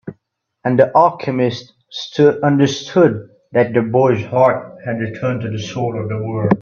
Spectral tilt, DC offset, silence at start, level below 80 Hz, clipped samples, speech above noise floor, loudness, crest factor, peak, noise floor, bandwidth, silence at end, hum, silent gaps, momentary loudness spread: -7 dB/octave; under 0.1%; 0.05 s; -56 dBFS; under 0.1%; 52 dB; -16 LUFS; 16 dB; 0 dBFS; -67 dBFS; 7.2 kHz; 0 s; none; none; 12 LU